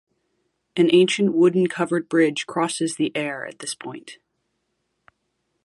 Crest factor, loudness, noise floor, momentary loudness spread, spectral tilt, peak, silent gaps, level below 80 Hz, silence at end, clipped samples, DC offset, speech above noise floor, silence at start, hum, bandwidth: 18 dB; -21 LUFS; -74 dBFS; 15 LU; -5 dB/octave; -6 dBFS; none; -74 dBFS; 1.5 s; under 0.1%; under 0.1%; 54 dB; 0.75 s; none; 11.5 kHz